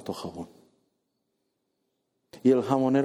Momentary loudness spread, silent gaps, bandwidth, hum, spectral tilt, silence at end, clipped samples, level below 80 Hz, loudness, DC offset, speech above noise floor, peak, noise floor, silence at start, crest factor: 20 LU; none; 13 kHz; none; -7.5 dB/octave; 0 s; under 0.1%; -70 dBFS; -25 LUFS; under 0.1%; 53 dB; -8 dBFS; -78 dBFS; 0.05 s; 20 dB